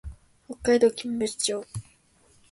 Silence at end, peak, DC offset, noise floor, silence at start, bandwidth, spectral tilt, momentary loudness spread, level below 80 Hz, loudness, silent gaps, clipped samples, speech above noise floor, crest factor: 0.7 s; -8 dBFS; under 0.1%; -61 dBFS; 0.05 s; 11.5 kHz; -3.5 dB/octave; 21 LU; -50 dBFS; -25 LUFS; none; under 0.1%; 36 dB; 18 dB